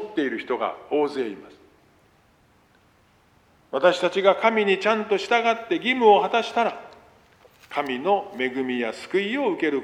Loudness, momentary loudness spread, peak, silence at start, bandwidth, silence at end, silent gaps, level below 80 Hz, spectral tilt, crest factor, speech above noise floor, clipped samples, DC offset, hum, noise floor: -23 LUFS; 9 LU; -4 dBFS; 0 s; 11 kHz; 0 s; none; -70 dBFS; -4.5 dB/octave; 20 dB; 37 dB; under 0.1%; under 0.1%; none; -59 dBFS